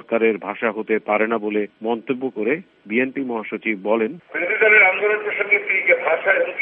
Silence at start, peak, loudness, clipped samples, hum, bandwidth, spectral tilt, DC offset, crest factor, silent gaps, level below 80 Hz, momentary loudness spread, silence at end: 0.1 s; -2 dBFS; -19 LUFS; under 0.1%; none; 3.8 kHz; -8.5 dB/octave; under 0.1%; 18 dB; none; -74 dBFS; 12 LU; 0 s